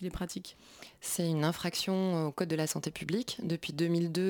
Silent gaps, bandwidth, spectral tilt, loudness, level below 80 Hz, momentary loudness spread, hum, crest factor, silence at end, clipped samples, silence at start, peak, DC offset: none; 19 kHz; -5 dB/octave; -33 LUFS; -58 dBFS; 11 LU; none; 16 dB; 0 s; under 0.1%; 0 s; -16 dBFS; under 0.1%